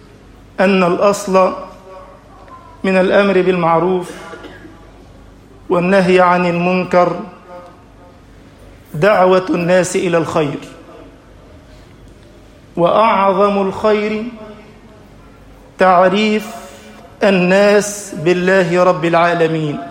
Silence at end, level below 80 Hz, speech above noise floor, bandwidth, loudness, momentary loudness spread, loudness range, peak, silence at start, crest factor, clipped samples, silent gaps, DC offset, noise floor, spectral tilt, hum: 0 s; -48 dBFS; 28 dB; 16 kHz; -13 LUFS; 19 LU; 4 LU; 0 dBFS; 0.6 s; 14 dB; under 0.1%; none; under 0.1%; -41 dBFS; -5.5 dB/octave; none